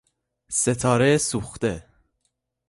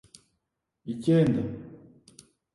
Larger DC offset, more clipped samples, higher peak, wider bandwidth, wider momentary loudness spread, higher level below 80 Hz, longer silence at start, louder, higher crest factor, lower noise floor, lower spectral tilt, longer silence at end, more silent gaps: neither; neither; first, -6 dBFS vs -12 dBFS; about the same, 11.5 kHz vs 11.5 kHz; second, 9 LU vs 22 LU; first, -50 dBFS vs -60 dBFS; second, 0.5 s vs 0.85 s; first, -22 LUFS vs -26 LUFS; about the same, 18 dB vs 18 dB; second, -75 dBFS vs -82 dBFS; second, -4.5 dB/octave vs -8.5 dB/octave; about the same, 0.9 s vs 0.8 s; neither